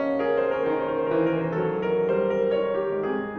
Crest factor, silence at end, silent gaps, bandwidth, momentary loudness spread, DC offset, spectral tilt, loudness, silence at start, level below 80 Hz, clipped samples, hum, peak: 12 dB; 0 s; none; 6 kHz; 3 LU; under 0.1%; -9 dB/octave; -25 LUFS; 0 s; -58 dBFS; under 0.1%; none; -12 dBFS